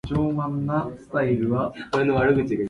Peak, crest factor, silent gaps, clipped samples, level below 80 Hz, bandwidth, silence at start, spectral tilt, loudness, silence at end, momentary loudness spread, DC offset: -8 dBFS; 14 dB; none; under 0.1%; -46 dBFS; 11 kHz; 0.05 s; -8.5 dB/octave; -24 LUFS; 0 s; 6 LU; under 0.1%